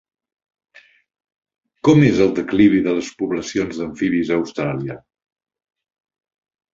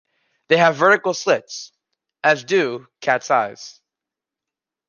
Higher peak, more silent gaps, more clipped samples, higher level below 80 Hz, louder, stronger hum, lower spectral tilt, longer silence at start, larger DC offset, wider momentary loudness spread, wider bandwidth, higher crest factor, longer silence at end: about the same, -2 dBFS vs -2 dBFS; neither; neither; first, -52 dBFS vs -74 dBFS; about the same, -18 LUFS vs -18 LUFS; neither; first, -7 dB/octave vs -4 dB/octave; first, 1.85 s vs 0.5 s; neither; second, 11 LU vs 18 LU; second, 7.6 kHz vs 9.8 kHz; about the same, 18 dB vs 20 dB; first, 1.75 s vs 1.2 s